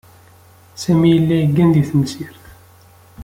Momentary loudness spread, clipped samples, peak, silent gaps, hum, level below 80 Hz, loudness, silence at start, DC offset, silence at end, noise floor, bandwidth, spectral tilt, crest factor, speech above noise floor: 15 LU; under 0.1%; -2 dBFS; none; none; -48 dBFS; -15 LUFS; 0.75 s; under 0.1%; 0 s; -46 dBFS; 16 kHz; -7.5 dB/octave; 14 dB; 32 dB